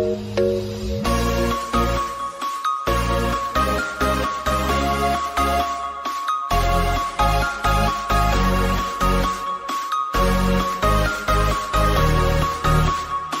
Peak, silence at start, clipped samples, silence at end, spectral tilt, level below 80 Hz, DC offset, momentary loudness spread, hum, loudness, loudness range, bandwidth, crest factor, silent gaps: -8 dBFS; 0 s; under 0.1%; 0 s; -5 dB/octave; -26 dBFS; under 0.1%; 6 LU; none; -21 LUFS; 2 LU; 16 kHz; 14 dB; none